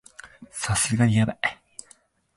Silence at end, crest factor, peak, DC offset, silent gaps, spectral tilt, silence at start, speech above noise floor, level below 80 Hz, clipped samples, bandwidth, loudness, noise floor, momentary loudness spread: 0.85 s; 18 dB; -8 dBFS; under 0.1%; none; -4.5 dB/octave; 0.25 s; 35 dB; -48 dBFS; under 0.1%; 11.5 kHz; -23 LUFS; -58 dBFS; 23 LU